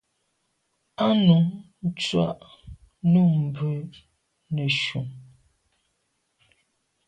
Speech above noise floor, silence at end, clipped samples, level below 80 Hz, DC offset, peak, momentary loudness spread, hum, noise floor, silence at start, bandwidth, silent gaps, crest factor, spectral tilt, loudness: 51 dB; 1.85 s; under 0.1%; -58 dBFS; under 0.1%; -8 dBFS; 16 LU; none; -74 dBFS; 1 s; 9 kHz; none; 18 dB; -7 dB/octave; -23 LUFS